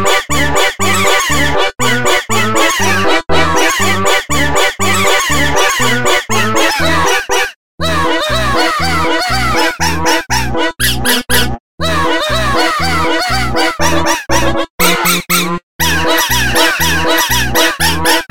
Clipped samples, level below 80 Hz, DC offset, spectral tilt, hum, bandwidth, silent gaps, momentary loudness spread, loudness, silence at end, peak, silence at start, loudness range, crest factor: under 0.1%; -28 dBFS; 10%; -3 dB/octave; none; 17 kHz; 7.56-7.78 s, 11.60-11.78 s, 14.70-14.78 s, 15.63-15.79 s; 3 LU; -12 LUFS; 0 s; 0 dBFS; 0 s; 2 LU; 14 dB